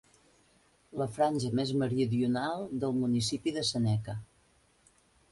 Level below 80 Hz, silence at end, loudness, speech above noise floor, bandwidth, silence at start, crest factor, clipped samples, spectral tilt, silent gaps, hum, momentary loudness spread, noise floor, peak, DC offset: -62 dBFS; 1.05 s; -31 LUFS; 37 dB; 11.5 kHz; 0.95 s; 16 dB; under 0.1%; -6 dB/octave; none; none; 7 LU; -67 dBFS; -16 dBFS; under 0.1%